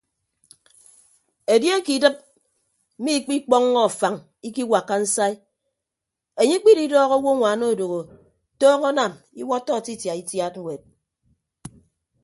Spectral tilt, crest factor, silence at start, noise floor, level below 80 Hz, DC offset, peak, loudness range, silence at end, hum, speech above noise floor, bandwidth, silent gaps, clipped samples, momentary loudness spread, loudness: -3.5 dB/octave; 20 dB; 1.5 s; -85 dBFS; -68 dBFS; under 0.1%; -2 dBFS; 4 LU; 0.55 s; none; 65 dB; 12 kHz; none; under 0.1%; 16 LU; -20 LUFS